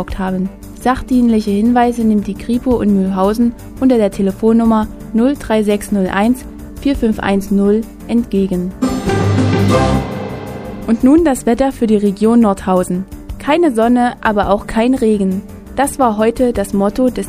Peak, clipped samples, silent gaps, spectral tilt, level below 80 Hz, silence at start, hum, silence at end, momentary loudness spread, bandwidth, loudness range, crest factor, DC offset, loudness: 0 dBFS; under 0.1%; none; -6.5 dB/octave; -32 dBFS; 0 s; none; 0 s; 8 LU; 15.5 kHz; 2 LU; 12 dB; under 0.1%; -14 LUFS